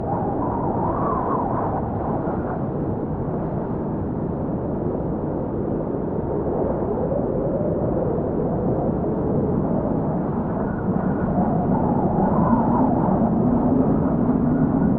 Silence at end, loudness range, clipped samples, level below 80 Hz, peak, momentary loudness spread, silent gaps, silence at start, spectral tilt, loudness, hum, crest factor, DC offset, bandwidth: 0 s; 6 LU; under 0.1%; -38 dBFS; -6 dBFS; 6 LU; none; 0 s; -11.5 dB/octave; -22 LUFS; none; 16 dB; under 0.1%; 3.2 kHz